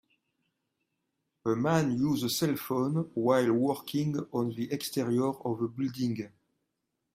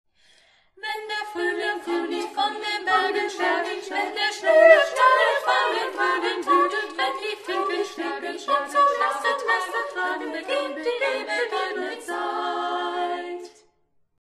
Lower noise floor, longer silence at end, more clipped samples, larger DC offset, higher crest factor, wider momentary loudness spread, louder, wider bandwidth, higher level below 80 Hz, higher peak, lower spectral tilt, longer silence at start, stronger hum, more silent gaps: first, -83 dBFS vs -66 dBFS; first, 0.85 s vs 0.7 s; neither; neither; about the same, 20 dB vs 22 dB; second, 7 LU vs 12 LU; second, -30 LUFS vs -23 LUFS; first, 16 kHz vs 13 kHz; about the same, -70 dBFS vs -70 dBFS; second, -12 dBFS vs -2 dBFS; first, -6 dB/octave vs -1 dB/octave; first, 1.45 s vs 0.85 s; neither; neither